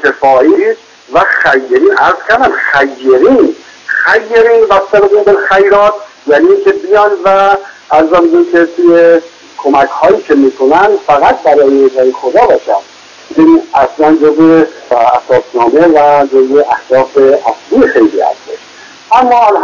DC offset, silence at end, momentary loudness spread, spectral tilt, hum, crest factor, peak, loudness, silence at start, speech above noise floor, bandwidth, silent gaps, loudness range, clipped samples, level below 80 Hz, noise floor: under 0.1%; 0 s; 6 LU; -5.5 dB/octave; none; 8 dB; 0 dBFS; -7 LUFS; 0 s; 27 dB; 7.4 kHz; none; 1 LU; 3%; -44 dBFS; -33 dBFS